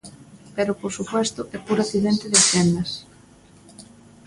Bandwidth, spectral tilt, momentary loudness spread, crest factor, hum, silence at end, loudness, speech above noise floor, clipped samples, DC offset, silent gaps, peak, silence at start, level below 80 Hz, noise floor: 11.5 kHz; -3.5 dB/octave; 16 LU; 22 dB; none; 0.45 s; -20 LUFS; 29 dB; under 0.1%; under 0.1%; none; -2 dBFS; 0.05 s; -54 dBFS; -50 dBFS